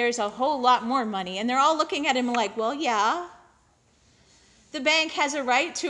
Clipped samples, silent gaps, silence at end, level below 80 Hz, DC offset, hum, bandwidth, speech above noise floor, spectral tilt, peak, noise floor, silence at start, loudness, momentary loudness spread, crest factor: under 0.1%; none; 0 s; -68 dBFS; under 0.1%; none; 11 kHz; 38 dB; -2 dB/octave; -6 dBFS; -62 dBFS; 0 s; -24 LUFS; 7 LU; 18 dB